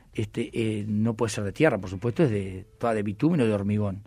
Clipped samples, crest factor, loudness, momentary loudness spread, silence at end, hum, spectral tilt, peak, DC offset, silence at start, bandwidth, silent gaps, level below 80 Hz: under 0.1%; 20 dB; -26 LUFS; 7 LU; 0.05 s; none; -7 dB/octave; -6 dBFS; under 0.1%; 0.15 s; 13 kHz; none; -54 dBFS